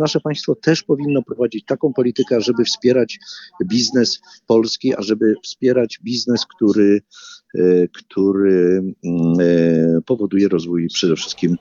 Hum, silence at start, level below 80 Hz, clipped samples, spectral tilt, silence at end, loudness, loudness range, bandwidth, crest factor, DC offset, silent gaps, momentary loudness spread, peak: none; 0 s; -58 dBFS; under 0.1%; -5.5 dB/octave; 0.05 s; -17 LUFS; 2 LU; 7.6 kHz; 16 dB; under 0.1%; none; 7 LU; -2 dBFS